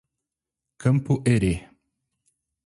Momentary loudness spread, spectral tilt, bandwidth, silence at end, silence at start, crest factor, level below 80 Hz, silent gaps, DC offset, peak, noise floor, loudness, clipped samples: 6 LU; -7.5 dB/octave; 11.5 kHz; 1.05 s; 0.8 s; 18 dB; -44 dBFS; none; under 0.1%; -8 dBFS; -87 dBFS; -23 LUFS; under 0.1%